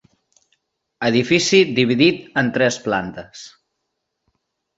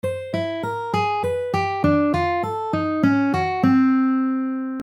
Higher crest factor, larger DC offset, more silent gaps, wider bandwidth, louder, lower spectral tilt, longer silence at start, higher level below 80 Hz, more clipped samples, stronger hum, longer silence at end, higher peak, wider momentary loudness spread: about the same, 20 dB vs 16 dB; neither; neither; second, 8 kHz vs 11 kHz; first, -17 LUFS vs -21 LUFS; second, -4.5 dB/octave vs -7.5 dB/octave; first, 1 s vs 0.05 s; second, -58 dBFS vs -50 dBFS; neither; neither; first, 1.3 s vs 0 s; first, 0 dBFS vs -4 dBFS; first, 18 LU vs 8 LU